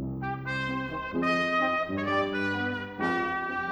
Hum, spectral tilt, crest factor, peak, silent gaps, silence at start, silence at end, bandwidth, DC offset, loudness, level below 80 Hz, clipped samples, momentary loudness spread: none; -6 dB/octave; 16 dB; -14 dBFS; none; 0 s; 0 s; over 20 kHz; under 0.1%; -29 LUFS; -54 dBFS; under 0.1%; 7 LU